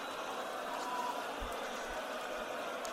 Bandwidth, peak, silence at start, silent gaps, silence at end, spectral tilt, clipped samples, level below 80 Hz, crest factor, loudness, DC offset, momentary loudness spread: 16 kHz; -24 dBFS; 0 s; none; 0 s; -2.5 dB/octave; under 0.1%; -60 dBFS; 16 dB; -40 LUFS; under 0.1%; 2 LU